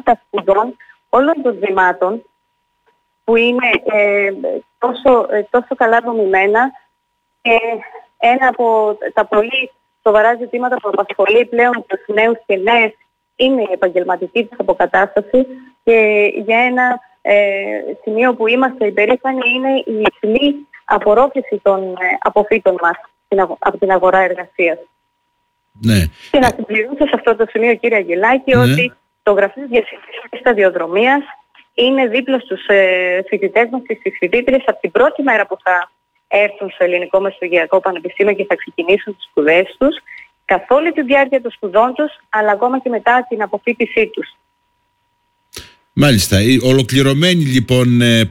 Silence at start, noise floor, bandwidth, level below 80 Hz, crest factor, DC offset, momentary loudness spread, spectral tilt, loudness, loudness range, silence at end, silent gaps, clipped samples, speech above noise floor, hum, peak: 0.05 s; -67 dBFS; 16.5 kHz; -44 dBFS; 12 dB; under 0.1%; 8 LU; -5.5 dB/octave; -14 LUFS; 2 LU; 0 s; none; under 0.1%; 54 dB; none; -2 dBFS